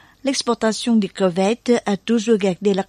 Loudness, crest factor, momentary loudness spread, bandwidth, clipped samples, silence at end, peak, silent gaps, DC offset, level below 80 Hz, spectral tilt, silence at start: -19 LUFS; 14 dB; 3 LU; 11 kHz; under 0.1%; 0.05 s; -4 dBFS; none; under 0.1%; -58 dBFS; -5 dB/octave; 0.25 s